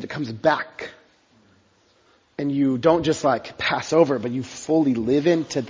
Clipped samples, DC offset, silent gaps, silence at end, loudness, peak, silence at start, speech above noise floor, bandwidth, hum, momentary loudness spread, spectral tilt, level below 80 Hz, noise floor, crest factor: under 0.1%; under 0.1%; none; 0 s; -21 LUFS; -4 dBFS; 0 s; 39 dB; 7.6 kHz; none; 11 LU; -5.5 dB/octave; -56 dBFS; -60 dBFS; 20 dB